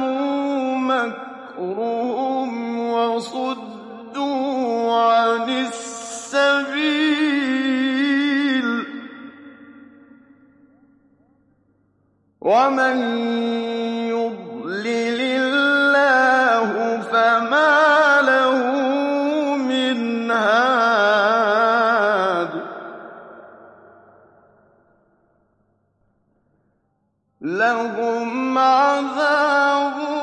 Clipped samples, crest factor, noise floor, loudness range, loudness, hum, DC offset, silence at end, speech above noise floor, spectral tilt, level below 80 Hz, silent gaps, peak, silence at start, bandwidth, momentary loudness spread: under 0.1%; 16 dB; -69 dBFS; 9 LU; -19 LUFS; none; under 0.1%; 0 s; 48 dB; -3.5 dB/octave; -76 dBFS; none; -4 dBFS; 0 s; 11 kHz; 13 LU